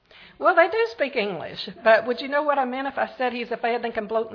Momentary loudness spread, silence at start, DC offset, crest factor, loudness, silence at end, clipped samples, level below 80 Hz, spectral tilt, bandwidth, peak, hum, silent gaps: 8 LU; 0.2 s; under 0.1%; 20 dB; -23 LUFS; 0 s; under 0.1%; -66 dBFS; -5.5 dB/octave; 5.4 kHz; -4 dBFS; none; none